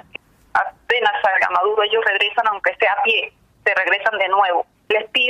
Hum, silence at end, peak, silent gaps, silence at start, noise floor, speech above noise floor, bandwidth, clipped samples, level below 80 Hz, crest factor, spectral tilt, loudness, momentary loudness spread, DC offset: none; 0 s; -4 dBFS; none; 0.55 s; -41 dBFS; 23 dB; 11.5 kHz; under 0.1%; -62 dBFS; 14 dB; -2 dB/octave; -18 LUFS; 6 LU; under 0.1%